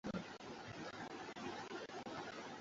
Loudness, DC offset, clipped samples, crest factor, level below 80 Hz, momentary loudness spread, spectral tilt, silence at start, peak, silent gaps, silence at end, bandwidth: -49 LUFS; under 0.1%; under 0.1%; 20 dB; -74 dBFS; 3 LU; -3.5 dB/octave; 0.05 s; -30 dBFS; none; 0 s; 7.6 kHz